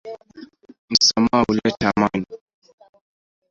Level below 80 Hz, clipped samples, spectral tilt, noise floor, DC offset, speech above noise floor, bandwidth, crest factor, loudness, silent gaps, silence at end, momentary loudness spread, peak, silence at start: -50 dBFS; under 0.1%; -3.5 dB/octave; -44 dBFS; under 0.1%; 25 dB; 7.6 kHz; 22 dB; -18 LUFS; 0.78-0.88 s; 1.15 s; 21 LU; 0 dBFS; 0.05 s